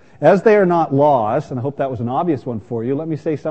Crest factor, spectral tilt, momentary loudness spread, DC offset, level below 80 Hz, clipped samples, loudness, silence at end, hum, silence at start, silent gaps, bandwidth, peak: 16 dB; -8.5 dB/octave; 11 LU; 0.4%; -58 dBFS; under 0.1%; -17 LUFS; 0 s; none; 0.2 s; none; 8.4 kHz; 0 dBFS